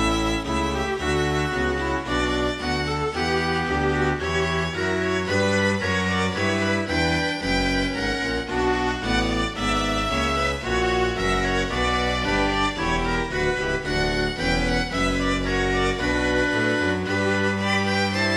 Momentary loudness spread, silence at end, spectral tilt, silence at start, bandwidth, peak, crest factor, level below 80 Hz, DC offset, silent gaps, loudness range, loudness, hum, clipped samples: 3 LU; 0 s; -4.5 dB/octave; 0 s; 18.5 kHz; -8 dBFS; 14 dB; -34 dBFS; under 0.1%; none; 1 LU; -23 LUFS; none; under 0.1%